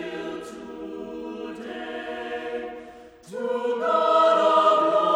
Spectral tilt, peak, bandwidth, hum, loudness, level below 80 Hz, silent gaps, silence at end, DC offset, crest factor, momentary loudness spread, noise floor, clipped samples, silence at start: -4.5 dB/octave; -8 dBFS; 10.5 kHz; none; -23 LUFS; -64 dBFS; none; 0 s; under 0.1%; 16 dB; 19 LU; -45 dBFS; under 0.1%; 0 s